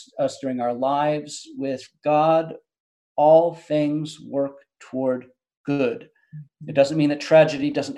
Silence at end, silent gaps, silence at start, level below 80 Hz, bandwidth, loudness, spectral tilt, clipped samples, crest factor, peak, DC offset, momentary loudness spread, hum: 0 s; 2.80-3.15 s, 5.57-5.64 s; 0 s; -72 dBFS; 10.5 kHz; -22 LUFS; -6 dB/octave; under 0.1%; 18 dB; -4 dBFS; under 0.1%; 15 LU; none